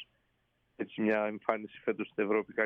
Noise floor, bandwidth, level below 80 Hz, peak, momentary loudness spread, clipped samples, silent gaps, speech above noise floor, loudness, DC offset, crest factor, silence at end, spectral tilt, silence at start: -76 dBFS; 5.2 kHz; -80 dBFS; -12 dBFS; 11 LU; under 0.1%; none; 43 dB; -33 LUFS; under 0.1%; 22 dB; 0 s; -8 dB/octave; 0 s